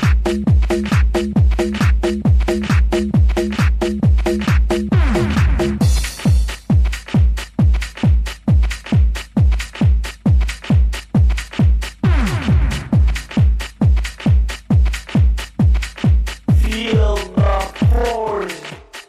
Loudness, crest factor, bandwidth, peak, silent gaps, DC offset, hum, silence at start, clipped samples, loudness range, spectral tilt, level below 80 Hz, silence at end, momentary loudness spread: -17 LUFS; 10 dB; 13.5 kHz; -4 dBFS; none; under 0.1%; none; 0 s; under 0.1%; 1 LU; -7 dB/octave; -18 dBFS; 0.05 s; 2 LU